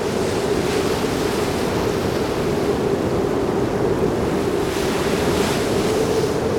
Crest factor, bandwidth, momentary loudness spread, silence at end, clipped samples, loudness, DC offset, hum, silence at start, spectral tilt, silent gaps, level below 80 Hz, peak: 12 dB; 19.5 kHz; 2 LU; 0 s; under 0.1%; -20 LUFS; 0.1%; none; 0 s; -5.5 dB/octave; none; -38 dBFS; -6 dBFS